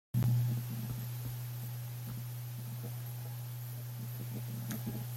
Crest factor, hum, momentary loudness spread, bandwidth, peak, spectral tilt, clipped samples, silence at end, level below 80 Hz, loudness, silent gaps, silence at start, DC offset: 16 dB; none; 10 LU; 16.5 kHz; -22 dBFS; -6 dB/octave; under 0.1%; 0 s; -64 dBFS; -39 LUFS; none; 0.15 s; under 0.1%